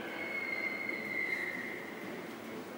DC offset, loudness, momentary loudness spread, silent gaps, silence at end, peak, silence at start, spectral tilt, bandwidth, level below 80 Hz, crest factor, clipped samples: under 0.1%; -37 LUFS; 9 LU; none; 0 s; -24 dBFS; 0 s; -4 dB/octave; 16 kHz; -84 dBFS; 16 dB; under 0.1%